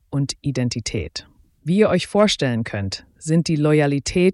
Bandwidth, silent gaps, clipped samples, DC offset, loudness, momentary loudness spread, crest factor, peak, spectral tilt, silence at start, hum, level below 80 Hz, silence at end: 12 kHz; none; under 0.1%; under 0.1%; -20 LUFS; 12 LU; 16 dB; -4 dBFS; -5.5 dB/octave; 0.1 s; none; -44 dBFS; 0 s